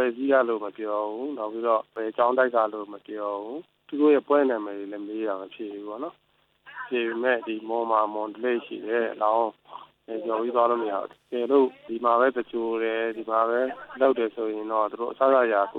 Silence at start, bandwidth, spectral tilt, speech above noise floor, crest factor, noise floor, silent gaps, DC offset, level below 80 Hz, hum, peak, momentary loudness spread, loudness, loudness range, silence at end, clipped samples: 0 s; 4.4 kHz; -7.5 dB/octave; 28 dB; 18 dB; -53 dBFS; none; under 0.1%; -78 dBFS; none; -8 dBFS; 14 LU; -26 LUFS; 4 LU; 0 s; under 0.1%